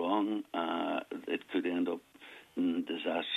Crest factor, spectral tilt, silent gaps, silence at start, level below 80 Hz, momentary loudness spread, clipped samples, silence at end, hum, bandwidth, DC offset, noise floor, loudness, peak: 16 dB; -5.5 dB/octave; none; 0 s; -82 dBFS; 10 LU; under 0.1%; 0 s; none; 13 kHz; under 0.1%; -55 dBFS; -35 LUFS; -18 dBFS